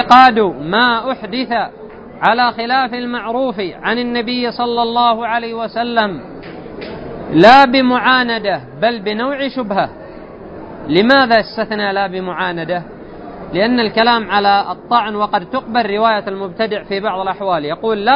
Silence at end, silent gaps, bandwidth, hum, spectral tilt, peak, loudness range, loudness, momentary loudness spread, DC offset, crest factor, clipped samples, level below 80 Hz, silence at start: 0 s; none; 8 kHz; none; -6 dB/octave; 0 dBFS; 5 LU; -14 LUFS; 18 LU; under 0.1%; 14 dB; 0.2%; -46 dBFS; 0 s